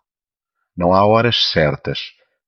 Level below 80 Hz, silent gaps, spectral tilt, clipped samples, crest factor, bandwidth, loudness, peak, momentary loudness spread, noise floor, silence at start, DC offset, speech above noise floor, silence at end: -44 dBFS; none; -6 dB/octave; under 0.1%; 16 dB; 6.6 kHz; -15 LUFS; -2 dBFS; 13 LU; under -90 dBFS; 0.75 s; under 0.1%; over 75 dB; 0.4 s